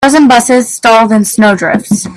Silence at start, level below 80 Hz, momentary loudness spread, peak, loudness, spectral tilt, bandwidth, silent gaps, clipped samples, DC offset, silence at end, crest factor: 0 s; -44 dBFS; 6 LU; 0 dBFS; -7 LUFS; -4 dB/octave; 15 kHz; none; 0.2%; under 0.1%; 0 s; 8 dB